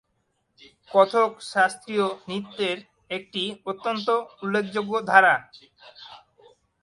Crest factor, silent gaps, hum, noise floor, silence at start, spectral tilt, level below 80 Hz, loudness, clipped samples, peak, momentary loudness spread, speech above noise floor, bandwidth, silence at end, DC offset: 24 dB; none; none; -73 dBFS; 0.9 s; -4 dB/octave; -72 dBFS; -24 LUFS; under 0.1%; -2 dBFS; 15 LU; 49 dB; 11.5 kHz; 0.65 s; under 0.1%